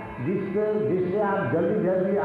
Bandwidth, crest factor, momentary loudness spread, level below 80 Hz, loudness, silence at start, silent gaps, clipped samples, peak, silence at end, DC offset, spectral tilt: 4.7 kHz; 10 dB; 3 LU; -58 dBFS; -25 LUFS; 0 s; none; under 0.1%; -14 dBFS; 0 s; under 0.1%; -10 dB/octave